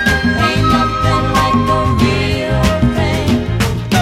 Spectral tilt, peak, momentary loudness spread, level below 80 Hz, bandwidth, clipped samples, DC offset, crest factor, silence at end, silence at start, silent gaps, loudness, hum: -5.5 dB/octave; 0 dBFS; 3 LU; -24 dBFS; 16 kHz; under 0.1%; under 0.1%; 14 dB; 0 s; 0 s; none; -14 LUFS; none